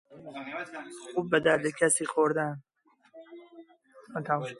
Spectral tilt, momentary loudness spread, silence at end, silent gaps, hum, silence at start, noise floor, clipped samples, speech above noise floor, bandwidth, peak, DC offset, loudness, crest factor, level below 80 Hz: -4 dB/octave; 23 LU; 0.05 s; none; none; 0.1 s; -57 dBFS; under 0.1%; 28 dB; 11.5 kHz; -10 dBFS; under 0.1%; -28 LUFS; 22 dB; -72 dBFS